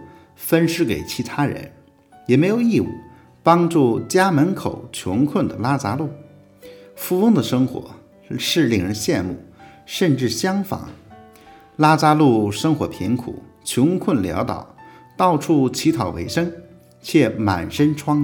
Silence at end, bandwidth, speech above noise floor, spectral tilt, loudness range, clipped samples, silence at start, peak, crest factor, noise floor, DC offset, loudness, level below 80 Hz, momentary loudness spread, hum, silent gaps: 0 s; over 20 kHz; 31 dB; -6 dB/octave; 3 LU; under 0.1%; 0 s; 0 dBFS; 20 dB; -49 dBFS; under 0.1%; -19 LUFS; -54 dBFS; 14 LU; none; none